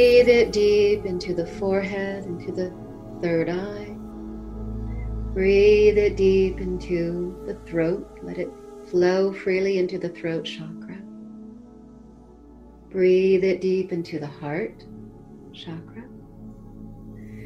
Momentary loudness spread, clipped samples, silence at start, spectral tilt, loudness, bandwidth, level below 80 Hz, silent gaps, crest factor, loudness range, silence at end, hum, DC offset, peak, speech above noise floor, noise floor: 24 LU; under 0.1%; 0 s; -6.5 dB/octave; -23 LUFS; 10.5 kHz; -40 dBFS; none; 18 dB; 9 LU; 0 s; none; under 0.1%; -4 dBFS; 25 dB; -47 dBFS